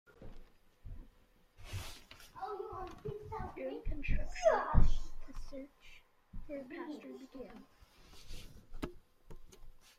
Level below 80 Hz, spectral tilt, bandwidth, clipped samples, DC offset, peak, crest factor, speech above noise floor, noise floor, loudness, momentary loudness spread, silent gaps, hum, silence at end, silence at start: -40 dBFS; -6 dB/octave; 7.8 kHz; under 0.1%; under 0.1%; -12 dBFS; 24 dB; 30 dB; -66 dBFS; -40 LUFS; 26 LU; none; none; 0.2 s; 0.2 s